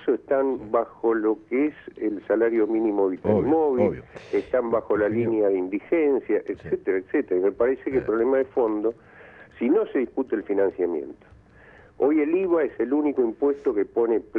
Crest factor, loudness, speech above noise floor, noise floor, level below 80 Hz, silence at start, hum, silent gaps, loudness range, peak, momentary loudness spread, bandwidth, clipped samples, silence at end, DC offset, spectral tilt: 16 dB; -24 LUFS; 28 dB; -51 dBFS; -58 dBFS; 0 s; none; none; 2 LU; -8 dBFS; 6 LU; 4.6 kHz; under 0.1%; 0 s; under 0.1%; -9.5 dB/octave